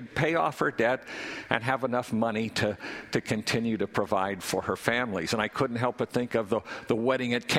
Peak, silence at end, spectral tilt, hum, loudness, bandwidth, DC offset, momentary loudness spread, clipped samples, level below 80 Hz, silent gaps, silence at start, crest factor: -4 dBFS; 0 s; -5 dB/octave; none; -29 LUFS; 16 kHz; under 0.1%; 5 LU; under 0.1%; -60 dBFS; none; 0 s; 24 dB